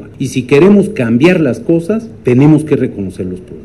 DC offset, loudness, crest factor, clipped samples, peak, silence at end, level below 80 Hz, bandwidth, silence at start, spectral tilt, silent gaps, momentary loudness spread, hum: 0.4%; -11 LUFS; 10 dB; under 0.1%; 0 dBFS; 0 s; -42 dBFS; 12.5 kHz; 0 s; -7.5 dB/octave; none; 13 LU; none